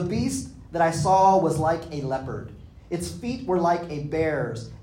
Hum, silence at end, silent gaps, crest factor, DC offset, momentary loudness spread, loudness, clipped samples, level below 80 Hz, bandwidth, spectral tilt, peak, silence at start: none; 0 s; none; 16 dB; under 0.1%; 14 LU; -24 LUFS; under 0.1%; -48 dBFS; 16 kHz; -6 dB/octave; -8 dBFS; 0 s